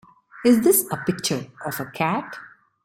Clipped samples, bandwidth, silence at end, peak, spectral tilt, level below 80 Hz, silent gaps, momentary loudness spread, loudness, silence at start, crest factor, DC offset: under 0.1%; 16.5 kHz; 0.35 s; -6 dBFS; -4 dB/octave; -62 dBFS; none; 14 LU; -22 LUFS; 0.35 s; 18 dB; under 0.1%